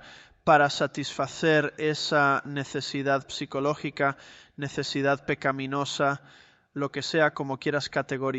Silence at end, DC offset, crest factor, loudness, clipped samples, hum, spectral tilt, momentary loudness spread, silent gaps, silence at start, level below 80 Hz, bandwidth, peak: 0 s; under 0.1%; 20 dB; -27 LUFS; under 0.1%; none; -4.5 dB/octave; 10 LU; none; 0 s; -64 dBFS; 8.2 kHz; -8 dBFS